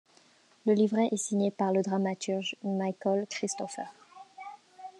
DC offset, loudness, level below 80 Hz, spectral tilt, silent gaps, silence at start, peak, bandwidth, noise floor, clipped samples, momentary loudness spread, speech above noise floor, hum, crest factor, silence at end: under 0.1%; -30 LUFS; -88 dBFS; -5 dB/octave; none; 0.65 s; -16 dBFS; 11 kHz; -62 dBFS; under 0.1%; 20 LU; 33 dB; none; 16 dB; 0.1 s